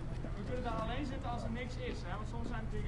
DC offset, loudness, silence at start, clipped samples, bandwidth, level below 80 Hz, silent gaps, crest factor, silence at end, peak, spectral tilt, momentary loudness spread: 0.1%; -41 LUFS; 0 s; under 0.1%; 11 kHz; -44 dBFS; none; 12 dB; 0 s; -26 dBFS; -7 dB/octave; 4 LU